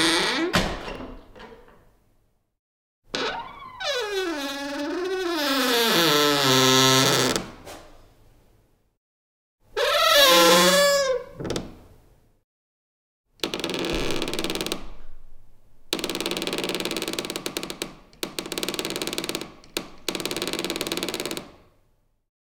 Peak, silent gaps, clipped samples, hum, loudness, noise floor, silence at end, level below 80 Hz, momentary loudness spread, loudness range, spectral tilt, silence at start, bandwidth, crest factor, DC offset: -4 dBFS; 2.59-3.02 s, 8.97-9.58 s, 12.44-13.24 s; under 0.1%; none; -22 LUFS; -65 dBFS; 1 s; -46 dBFS; 18 LU; 11 LU; -2.5 dB/octave; 0 s; 18 kHz; 22 dB; under 0.1%